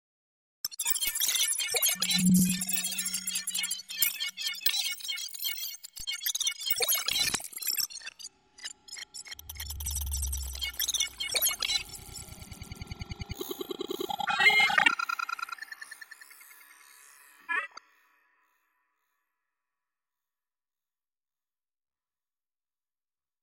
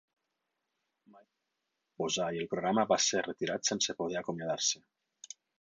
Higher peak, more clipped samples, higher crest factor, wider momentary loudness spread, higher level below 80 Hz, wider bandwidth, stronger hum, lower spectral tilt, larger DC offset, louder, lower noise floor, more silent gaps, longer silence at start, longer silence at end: first, -8 dBFS vs -16 dBFS; neither; about the same, 24 dB vs 20 dB; first, 19 LU vs 12 LU; first, -50 dBFS vs -74 dBFS; first, 17 kHz vs 9.6 kHz; neither; about the same, -1.5 dB/octave vs -2.5 dB/octave; neither; first, -28 LUFS vs -32 LUFS; first, under -90 dBFS vs -85 dBFS; neither; second, 0.65 s vs 1.15 s; first, 5.65 s vs 0.85 s